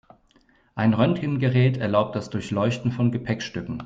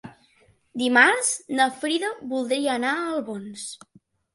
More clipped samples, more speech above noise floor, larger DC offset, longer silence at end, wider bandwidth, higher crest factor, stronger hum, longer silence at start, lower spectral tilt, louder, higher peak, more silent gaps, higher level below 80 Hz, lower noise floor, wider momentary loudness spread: neither; about the same, 38 dB vs 37 dB; neither; second, 0 s vs 0.6 s; second, 7.8 kHz vs 11.5 kHz; about the same, 18 dB vs 22 dB; neither; first, 0.75 s vs 0.05 s; first, -7.5 dB/octave vs -1.5 dB/octave; about the same, -23 LUFS vs -22 LUFS; second, -6 dBFS vs -2 dBFS; neither; first, -54 dBFS vs -72 dBFS; about the same, -60 dBFS vs -61 dBFS; second, 8 LU vs 19 LU